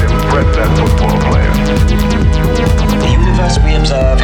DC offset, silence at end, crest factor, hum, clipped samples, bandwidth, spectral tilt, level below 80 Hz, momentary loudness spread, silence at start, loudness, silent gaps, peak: under 0.1%; 0 s; 10 dB; none; under 0.1%; 16 kHz; -6.5 dB/octave; -12 dBFS; 1 LU; 0 s; -12 LUFS; none; 0 dBFS